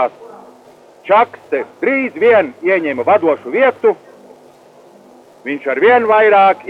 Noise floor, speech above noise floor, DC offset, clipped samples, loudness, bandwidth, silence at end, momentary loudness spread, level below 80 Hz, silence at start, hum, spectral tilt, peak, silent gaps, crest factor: -43 dBFS; 31 dB; under 0.1%; under 0.1%; -13 LUFS; 6.4 kHz; 0 s; 12 LU; -68 dBFS; 0 s; none; -6.5 dB/octave; -2 dBFS; none; 12 dB